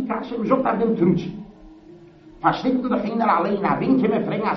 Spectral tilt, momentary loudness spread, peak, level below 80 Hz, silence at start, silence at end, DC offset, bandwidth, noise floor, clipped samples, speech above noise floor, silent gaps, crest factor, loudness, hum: -6 dB/octave; 7 LU; -4 dBFS; -52 dBFS; 0 s; 0 s; under 0.1%; 6.2 kHz; -46 dBFS; under 0.1%; 25 dB; none; 16 dB; -21 LUFS; none